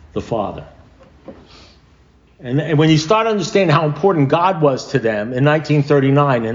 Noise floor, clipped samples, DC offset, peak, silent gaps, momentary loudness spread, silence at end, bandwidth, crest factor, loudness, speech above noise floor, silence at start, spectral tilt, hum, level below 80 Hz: -50 dBFS; under 0.1%; under 0.1%; -2 dBFS; none; 9 LU; 0 s; 7.6 kHz; 14 dB; -16 LUFS; 35 dB; 0.15 s; -6.5 dB/octave; none; -48 dBFS